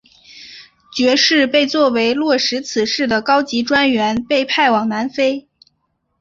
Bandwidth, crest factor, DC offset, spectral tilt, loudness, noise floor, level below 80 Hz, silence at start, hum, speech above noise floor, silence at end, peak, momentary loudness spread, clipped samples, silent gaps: 7.8 kHz; 16 dB; under 0.1%; -3 dB/octave; -15 LUFS; -68 dBFS; -56 dBFS; 0.3 s; none; 53 dB; 0.8 s; -2 dBFS; 8 LU; under 0.1%; none